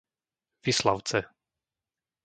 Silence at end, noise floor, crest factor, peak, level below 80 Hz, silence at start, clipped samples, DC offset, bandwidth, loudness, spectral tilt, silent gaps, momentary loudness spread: 1 s; under -90 dBFS; 24 dB; -8 dBFS; -62 dBFS; 0.65 s; under 0.1%; under 0.1%; 9.6 kHz; -28 LUFS; -3.5 dB/octave; none; 10 LU